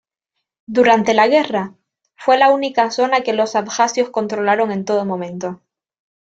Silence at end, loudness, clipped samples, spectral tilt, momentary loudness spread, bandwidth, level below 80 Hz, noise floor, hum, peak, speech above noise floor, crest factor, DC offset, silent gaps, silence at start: 0.75 s; -16 LUFS; under 0.1%; -4 dB/octave; 11 LU; 8 kHz; -64 dBFS; -78 dBFS; none; 0 dBFS; 62 dB; 16 dB; under 0.1%; none; 0.7 s